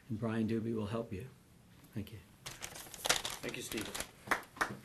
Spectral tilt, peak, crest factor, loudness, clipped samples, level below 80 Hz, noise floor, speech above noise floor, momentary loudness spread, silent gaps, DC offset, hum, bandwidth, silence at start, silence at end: -3.5 dB/octave; -12 dBFS; 28 dB; -39 LUFS; under 0.1%; -64 dBFS; -61 dBFS; 22 dB; 15 LU; none; under 0.1%; none; 13 kHz; 0.05 s; 0 s